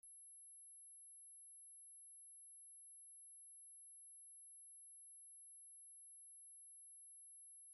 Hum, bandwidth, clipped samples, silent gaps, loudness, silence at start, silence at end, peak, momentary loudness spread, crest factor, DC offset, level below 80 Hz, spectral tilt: none; 16 kHz; under 0.1%; none; -58 LUFS; 0.05 s; 0 s; -56 dBFS; 0 LU; 4 dB; under 0.1%; under -90 dBFS; 4 dB/octave